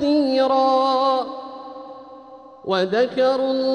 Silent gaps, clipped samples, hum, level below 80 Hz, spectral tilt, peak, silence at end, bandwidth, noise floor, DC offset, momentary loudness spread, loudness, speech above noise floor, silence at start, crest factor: none; under 0.1%; none; -64 dBFS; -5.5 dB/octave; -6 dBFS; 0 s; 9.2 kHz; -42 dBFS; under 0.1%; 19 LU; -19 LUFS; 24 dB; 0 s; 14 dB